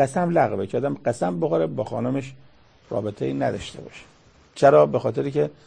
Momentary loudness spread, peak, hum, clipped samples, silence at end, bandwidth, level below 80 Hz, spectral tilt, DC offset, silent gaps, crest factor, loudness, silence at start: 18 LU; -4 dBFS; none; under 0.1%; 0.15 s; 9.8 kHz; -56 dBFS; -7 dB/octave; under 0.1%; none; 20 dB; -22 LUFS; 0 s